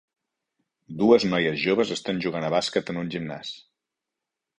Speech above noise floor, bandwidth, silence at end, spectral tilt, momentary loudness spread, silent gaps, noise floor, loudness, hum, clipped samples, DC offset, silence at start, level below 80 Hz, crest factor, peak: 62 dB; 10.5 kHz; 1 s; -5 dB/octave; 17 LU; none; -86 dBFS; -24 LUFS; none; under 0.1%; under 0.1%; 0.9 s; -62 dBFS; 22 dB; -4 dBFS